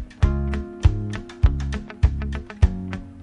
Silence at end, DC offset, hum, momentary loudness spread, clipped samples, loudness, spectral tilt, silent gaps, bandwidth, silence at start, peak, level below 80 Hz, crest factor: 0 s; under 0.1%; none; 9 LU; under 0.1%; -24 LUFS; -7.5 dB/octave; none; 9 kHz; 0 s; -2 dBFS; -24 dBFS; 20 dB